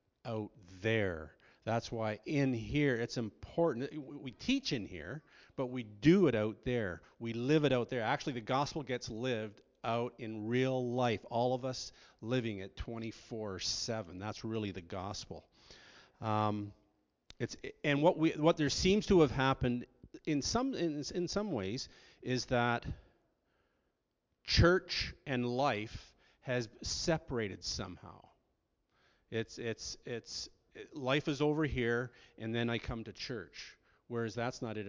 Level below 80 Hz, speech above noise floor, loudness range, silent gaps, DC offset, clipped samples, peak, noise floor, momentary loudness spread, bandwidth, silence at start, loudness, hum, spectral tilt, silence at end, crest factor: -54 dBFS; 48 dB; 8 LU; none; under 0.1%; under 0.1%; -14 dBFS; -83 dBFS; 16 LU; 7.6 kHz; 0.25 s; -35 LUFS; none; -5.5 dB/octave; 0 s; 22 dB